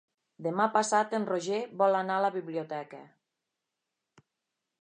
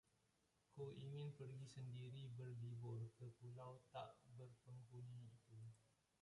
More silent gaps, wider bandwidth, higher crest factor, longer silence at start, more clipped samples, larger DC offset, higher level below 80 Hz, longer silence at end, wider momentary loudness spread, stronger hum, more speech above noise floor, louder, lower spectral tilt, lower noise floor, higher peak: neither; about the same, 10.5 kHz vs 11 kHz; first, 20 dB vs 14 dB; second, 0.4 s vs 0.7 s; neither; neither; about the same, -88 dBFS vs -84 dBFS; first, 1.75 s vs 0.35 s; first, 13 LU vs 9 LU; neither; first, 57 dB vs 28 dB; first, -30 LUFS vs -57 LUFS; second, -4.5 dB/octave vs -7 dB/octave; about the same, -86 dBFS vs -84 dBFS; first, -12 dBFS vs -42 dBFS